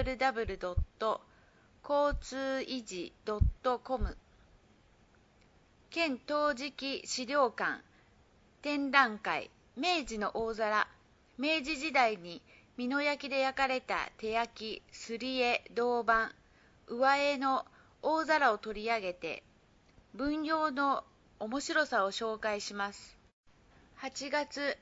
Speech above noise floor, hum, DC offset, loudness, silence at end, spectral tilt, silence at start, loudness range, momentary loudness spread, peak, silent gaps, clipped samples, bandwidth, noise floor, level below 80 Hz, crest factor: 32 dB; none; under 0.1%; -33 LUFS; 0.05 s; -2.5 dB/octave; 0 s; 5 LU; 13 LU; -8 dBFS; 23.33-23.43 s; under 0.1%; 7.6 kHz; -65 dBFS; -48 dBFS; 26 dB